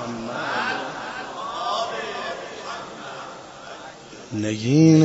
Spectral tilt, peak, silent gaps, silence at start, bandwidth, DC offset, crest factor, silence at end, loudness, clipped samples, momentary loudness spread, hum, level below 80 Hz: -6 dB/octave; -4 dBFS; none; 0 s; 8 kHz; under 0.1%; 18 dB; 0 s; -25 LUFS; under 0.1%; 16 LU; none; -60 dBFS